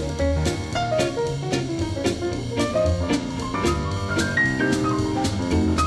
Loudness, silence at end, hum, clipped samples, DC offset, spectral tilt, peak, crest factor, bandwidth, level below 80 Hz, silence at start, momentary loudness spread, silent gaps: -23 LUFS; 0 s; none; under 0.1%; under 0.1%; -5.5 dB/octave; -8 dBFS; 14 dB; 13 kHz; -34 dBFS; 0 s; 5 LU; none